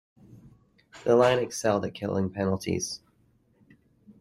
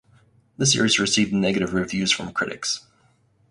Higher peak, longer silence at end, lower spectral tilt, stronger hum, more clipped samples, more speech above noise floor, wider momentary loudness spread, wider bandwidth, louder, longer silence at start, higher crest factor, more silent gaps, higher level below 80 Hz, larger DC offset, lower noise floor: second, -8 dBFS vs -4 dBFS; second, 0.1 s vs 0.7 s; first, -5 dB/octave vs -3 dB/octave; neither; neither; about the same, 40 dB vs 39 dB; first, 12 LU vs 9 LU; first, 15.5 kHz vs 11.5 kHz; second, -27 LUFS vs -21 LUFS; second, 0.35 s vs 0.6 s; about the same, 20 dB vs 18 dB; neither; second, -64 dBFS vs -54 dBFS; neither; first, -65 dBFS vs -61 dBFS